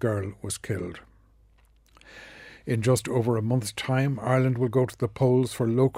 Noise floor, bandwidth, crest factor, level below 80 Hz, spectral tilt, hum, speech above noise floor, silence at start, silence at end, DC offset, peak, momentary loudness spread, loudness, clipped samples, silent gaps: -59 dBFS; 16 kHz; 18 dB; -58 dBFS; -6.5 dB/octave; none; 34 dB; 0 s; 0 s; under 0.1%; -10 dBFS; 19 LU; -26 LUFS; under 0.1%; none